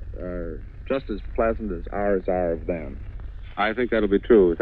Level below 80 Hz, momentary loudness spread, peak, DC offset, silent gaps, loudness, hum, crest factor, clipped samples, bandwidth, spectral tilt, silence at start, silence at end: -36 dBFS; 19 LU; -6 dBFS; under 0.1%; none; -24 LUFS; none; 18 dB; under 0.1%; 4.5 kHz; -10 dB/octave; 0 s; 0 s